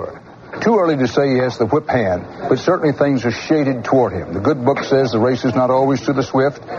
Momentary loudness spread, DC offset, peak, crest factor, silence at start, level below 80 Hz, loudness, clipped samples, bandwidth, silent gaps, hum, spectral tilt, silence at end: 5 LU; under 0.1%; -2 dBFS; 14 dB; 0 s; -50 dBFS; -17 LUFS; under 0.1%; 7.2 kHz; none; none; -7 dB/octave; 0 s